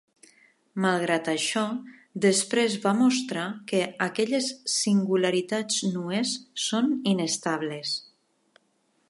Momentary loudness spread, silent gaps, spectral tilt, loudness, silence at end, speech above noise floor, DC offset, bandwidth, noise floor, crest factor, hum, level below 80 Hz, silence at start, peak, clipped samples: 8 LU; none; -3.5 dB/octave; -26 LUFS; 1.1 s; 44 dB; under 0.1%; 11.5 kHz; -70 dBFS; 18 dB; none; -78 dBFS; 0.75 s; -8 dBFS; under 0.1%